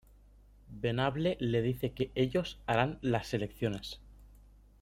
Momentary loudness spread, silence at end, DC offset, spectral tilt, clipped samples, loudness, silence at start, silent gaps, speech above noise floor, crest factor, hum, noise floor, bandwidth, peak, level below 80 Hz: 9 LU; 0.55 s; under 0.1%; -6.5 dB/octave; under 0.1%; -33 LUFS; 0.7 s; none; 27 dB; 22 dB; 50 Hz at -55 dBFS; -59 dBFS; 16 kHz; -12 dBFS; -54 dBFS